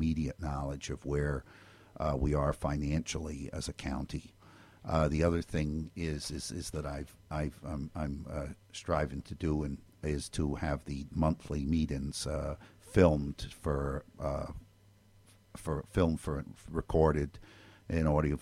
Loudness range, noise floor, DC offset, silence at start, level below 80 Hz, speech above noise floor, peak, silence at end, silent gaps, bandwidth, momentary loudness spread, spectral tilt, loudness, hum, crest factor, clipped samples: 5 LU; -62 dBFS; under 0.1%; 0 s; -44 dBFS; 29 dB; -10 dBFS; 0 s; none; 14 kHz; 12 LU; -6.5 dB/octave; -35 LUFS; none; 24 dB; under 0.1%